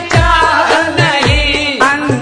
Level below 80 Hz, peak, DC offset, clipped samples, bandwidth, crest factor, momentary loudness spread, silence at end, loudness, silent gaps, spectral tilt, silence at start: -22 dBFS; 0 dBFS; under 0.1%; under 0.1%; 10.5 kHz; 10 dB; 2 LU; 0 s; -10 LUFS; none; -4.5 dB/octave; 0 s